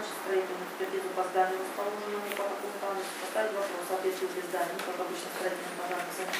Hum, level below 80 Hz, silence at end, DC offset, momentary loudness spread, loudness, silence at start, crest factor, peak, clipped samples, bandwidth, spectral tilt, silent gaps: none; under -90 dBFS; 0 s; under 0.1%; 5 LU; -33 LUFS; 0 s; 18 dB; -14 dBFS; under 0.1%; 16 kHz; -3 dB/octave; none